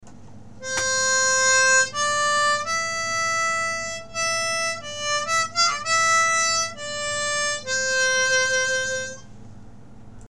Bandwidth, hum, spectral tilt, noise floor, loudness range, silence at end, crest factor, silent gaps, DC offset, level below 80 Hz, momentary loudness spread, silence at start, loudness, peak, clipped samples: 14 kHz; none; 0.5 dB/octave; -45 dBFS; 3 LU; 0 s; 14 dB; none; 0.7%; -54 dBFS; 10 LU; 0 s; -21 LUFS; -8 dBFS; under 0.1%